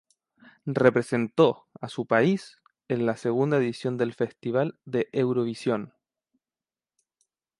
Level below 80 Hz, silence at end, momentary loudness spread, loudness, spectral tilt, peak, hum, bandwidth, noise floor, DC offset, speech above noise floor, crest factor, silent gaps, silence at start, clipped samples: -70 dBFS; 1.7 s; 10 LU; -26 LUFS; -7 dB/octave; -6 dBFS; none; 11.5 kHz; under -90 dBFS; under 0.1%; over 65 dB; 22 dB; none; 0.65 s; under 0.1%